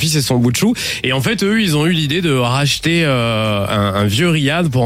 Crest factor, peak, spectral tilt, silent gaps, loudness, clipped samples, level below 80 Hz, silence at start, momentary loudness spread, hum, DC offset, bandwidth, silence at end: 12 dB; -2 dBFS; -5 dB/octave; none; -15 LUFS; under 0.1%; -42 dBFS; 0 s; 2 LU; none; under 0.1%; 16.5 kHz; 0 s